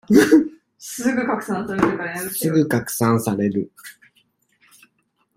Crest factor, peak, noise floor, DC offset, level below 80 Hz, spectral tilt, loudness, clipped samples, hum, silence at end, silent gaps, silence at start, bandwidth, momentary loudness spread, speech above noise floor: 20 dB; -2 dBFS; -68 dBFS; under 0.1%; -56 dBFS; -5.5 dB/octave; -20 LUFS; under 0.1%; none; 1.45 s; none; 0.1 s; 16.5 kHz; 18 LU; 49 dB